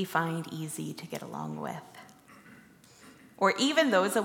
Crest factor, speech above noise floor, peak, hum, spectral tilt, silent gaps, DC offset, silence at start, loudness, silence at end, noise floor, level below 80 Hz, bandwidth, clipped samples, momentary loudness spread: 20 dB; 26 dB; -10 dBFS; none; -4 dB/octave; none; under 0.1%; 0 s; -30 LUFS; 0 s; -56 dBFS; -78 dBFS; 17.5 kHz; under 0.1%; 16 LU